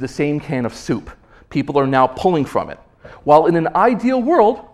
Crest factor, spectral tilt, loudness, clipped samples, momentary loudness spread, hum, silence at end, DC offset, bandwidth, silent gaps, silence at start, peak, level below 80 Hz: 16 dB; -7 dB/octave; -17 LUFS; under 0.1%; 11 LU; none; 0.1 s; under 0.1%; 12.5 kHz; none; 0 s; 0 dBFS; -46 dBFS